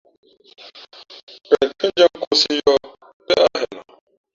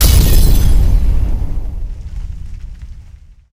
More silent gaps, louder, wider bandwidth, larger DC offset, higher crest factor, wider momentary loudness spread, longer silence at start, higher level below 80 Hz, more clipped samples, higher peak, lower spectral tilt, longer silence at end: first, 2.27-2.31 s, 3.13-3.20 s vs none; about the same, -17 LUFS vs -15 LUFS; second, 7.6 kHz vs 16.5 kHz; neither; first, 18 dB vs 12 dB; first, 24 LU vs 21 LU; first, 1.5 s vs 0 s; second, -58 dBFS vs -12 dBFS; neither; about the same, -2 dBFS vs 0 dBFS; second, -2.5 dB/octave vs -5 dB/octave; about the same, 0.55 s vs 0.5 s